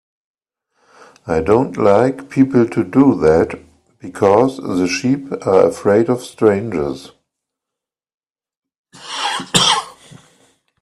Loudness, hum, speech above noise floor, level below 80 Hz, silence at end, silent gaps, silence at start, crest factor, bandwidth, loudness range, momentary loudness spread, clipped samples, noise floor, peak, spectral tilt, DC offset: -15 LUFS; none; 70 dB; -48 dBFS; 0.9 s; 8.14-8.18 s, 8.57-8.62 s, 8.78-8.84 s; 1.25 s; 16 dB; 13 kHz; 6 LU; 12 LU; under 0.1%; -84 dBFS; 0 dBFS; -5 dB/octave; under 0.1%